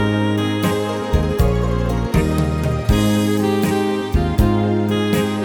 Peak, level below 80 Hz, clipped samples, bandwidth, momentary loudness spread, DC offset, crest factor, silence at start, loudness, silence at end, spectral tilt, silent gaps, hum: -2 dBFS; -26 dBFS; under 0.1%; 18.5 kHz; 3 LU; under 0.1%; 16 dB; 0 s; -18 LUFS; 0 s; -6.5 dB/octave; none; none